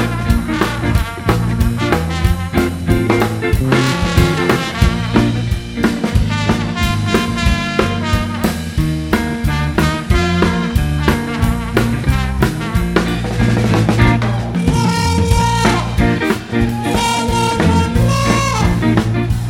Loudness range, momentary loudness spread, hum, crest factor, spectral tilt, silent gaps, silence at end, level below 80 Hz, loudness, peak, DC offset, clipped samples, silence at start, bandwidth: 2 LU; 4 LU; none; 14 dB; -6 dB/octave; none; 0 s; -22 dBFS; -15 LUFS; 0 dBFS; under 0.1%; under 0.1%; 0 s; 16.5 kHz